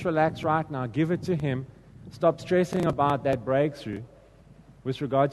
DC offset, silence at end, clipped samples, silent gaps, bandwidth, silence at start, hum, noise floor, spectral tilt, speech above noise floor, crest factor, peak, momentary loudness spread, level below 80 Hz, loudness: under 0.1%; 0 s; under 0.1%; none; 12 kHz; 0 s; none; -53 dBFS; -7.5 dB/octave; 27 dB; 18 dB; -8 dBFS; 13 LU; -56 dBFS; -27 LUFS